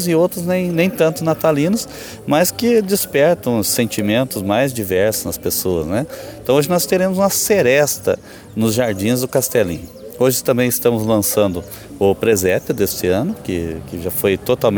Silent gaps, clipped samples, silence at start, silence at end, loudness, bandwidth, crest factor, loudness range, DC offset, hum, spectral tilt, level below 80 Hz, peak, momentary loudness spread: none; under 0.1%; 0 s; 0 s; -17 LUFS; over 20 kHz; 16 dB; 2 LU; under 0.1%; none; -4.5 dB/octave; -46 dBFS; 0 dBFS; 8 LU